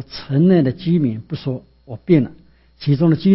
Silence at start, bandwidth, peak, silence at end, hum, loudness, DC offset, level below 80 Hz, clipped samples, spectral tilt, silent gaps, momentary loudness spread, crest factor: 0 s; 5.8 kHz; -2 dBFS; 0 s; none; -18 LUFS; under 0.1%; -50 dBFS; under 0.1%; -12.5 dB/octave; none; 14 LU; 16 dB